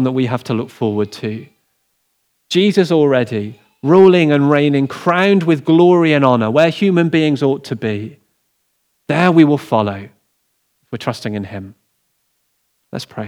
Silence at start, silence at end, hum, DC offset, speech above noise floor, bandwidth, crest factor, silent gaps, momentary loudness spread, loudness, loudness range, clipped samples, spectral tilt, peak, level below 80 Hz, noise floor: 0 s; 0 s; none; under 0.1%; 52 dB; 13 kHz; 16 dB; none; 16 LU; -14 LUFS; 6 LU; under 0.1%; -7 dB/octave; 0 dBFS; -68 dBFS; -66 dBFS